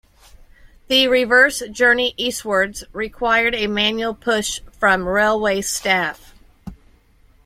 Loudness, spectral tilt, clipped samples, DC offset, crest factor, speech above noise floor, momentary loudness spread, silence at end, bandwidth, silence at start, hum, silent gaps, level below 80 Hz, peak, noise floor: -17 LUFS; -2.5 dB/octave; under 0.1%; under 0.1%; 18 dB; 35 dB; 9 LU; 0.7 s; 16 kHz; 0.9 s; none; none; -46 dBFS; 0 dBFS; -53 dBFS